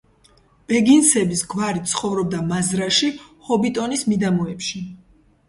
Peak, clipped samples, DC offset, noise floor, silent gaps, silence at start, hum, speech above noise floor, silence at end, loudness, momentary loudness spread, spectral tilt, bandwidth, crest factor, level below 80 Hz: -2 dBFS; under 0.1%; under 0.1%; -55 dBFS; none; 0.7 s; none; 36 dB; 0.5 s; -19 LUFS; 13 LU; -4 dB/octave; 11.5 kHz; 20 dB; -54 dBFS